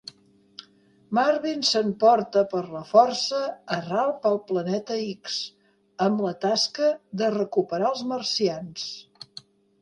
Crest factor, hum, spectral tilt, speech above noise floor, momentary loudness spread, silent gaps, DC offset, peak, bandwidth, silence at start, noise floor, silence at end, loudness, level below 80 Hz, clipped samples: 20 dB; none; -4 dB/octave; 34 dB; 18 LU; none; under 0.1%; -4 dBFS; 11 kHz; 0.6 s; -58 dBFS; 0.8 s; -24 LUFS; -72 dBFS; under 0.1%